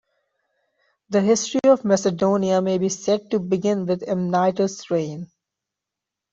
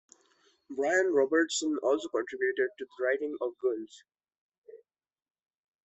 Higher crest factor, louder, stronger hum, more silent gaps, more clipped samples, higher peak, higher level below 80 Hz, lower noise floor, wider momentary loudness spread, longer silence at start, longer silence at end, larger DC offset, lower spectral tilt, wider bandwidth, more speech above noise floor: about the same, 18 dB vs 18 dB; first, -21 LUFS vs -30 LUFS; neither; second, none vs 4.38-4.49 s, 4.58-4.62 s; neither; first, -4 dBFS vs -14 dBFS; first, -64 dBFS vs -80 dBFS; first, -85 dBFS vs -68 dBFS; about the same, 7 LU vs 9 LU; first, 1.1 s vs 0.7 s; about the same, 1.1 s vs 1.1 s; neither; first, -5.5 dB/octave vs -2 dB/octave; about the same, 8 kHz vs 8.2 kHz; first, 65 dB vs 38 dB